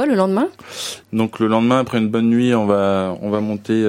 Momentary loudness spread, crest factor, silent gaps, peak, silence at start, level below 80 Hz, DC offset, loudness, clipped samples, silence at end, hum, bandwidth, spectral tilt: 8 LU; 16 dB; none; -2 dBFS; 0 s; -60 dBFS; under 0.1%; -18 LUFS; under 0.1%; 0 s; none; 15 kHz; -6 dB/octave